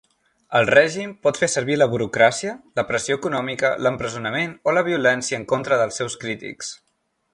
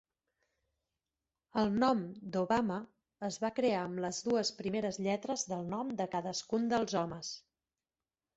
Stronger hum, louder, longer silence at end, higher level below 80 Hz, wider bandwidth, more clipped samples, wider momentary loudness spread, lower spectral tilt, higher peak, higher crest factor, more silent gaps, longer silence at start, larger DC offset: neither; first, -21 LUFS vs -35 LUFS; second, 0.6 s vs 0.95 s; first, -58 dBFS vs -70 dBFS; first, 11.5 kHz vs 8 kHz; neither; about the same, 11 LU vs 10 LU; about the same, -4 dB/octave vs -4.5 dB/octave; first, -2 dBFS vs -18 dBFS; about the same, 20 dB vs 18 dB; neither; second, 0.5 s vs 1.55 s; neither